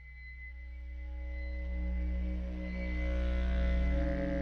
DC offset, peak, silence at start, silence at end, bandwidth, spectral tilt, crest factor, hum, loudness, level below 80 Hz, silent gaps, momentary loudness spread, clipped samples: under 0.1%; -22 dBFS; 0 s; 0 s; 5.4 kHz; -8.5 dB/octave; 12 dB; none; -36 LUFS; -34 dBFS; none; 14 LU; under 0.1%